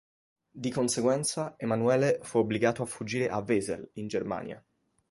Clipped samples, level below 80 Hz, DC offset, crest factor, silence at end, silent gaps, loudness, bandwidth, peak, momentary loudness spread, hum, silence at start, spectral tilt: under 0.1%; -64 dBFS; under 0.1%; 20 dB; 0.5 s; none; -29 LUFS; 12 kHz; -10 dBFS; 11 LU; none; 0.55 s; -5 dB/octave